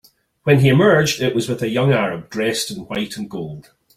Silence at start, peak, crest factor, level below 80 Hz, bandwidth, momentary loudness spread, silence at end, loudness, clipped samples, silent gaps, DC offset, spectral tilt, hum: 0.45 s; -2 dBFS; 16 dB; -52 dBFS; 16 kHz; 15 LU; 0.35 s; -18 LUFS; under 0.1%; none; under 0.1%; -5.5 dB/octave; none